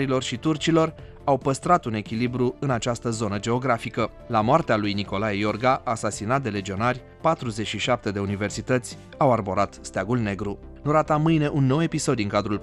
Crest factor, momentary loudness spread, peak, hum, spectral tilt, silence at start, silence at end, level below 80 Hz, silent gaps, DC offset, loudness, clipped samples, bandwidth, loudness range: 18 dB; 7 LU; -6 dBFS; none; -5.5 dB/octave; 0 s; 0 s; -48 dBFS; none; under 0.1%; -24 LUFS; under 0.1%; 12 kHz; 2 LU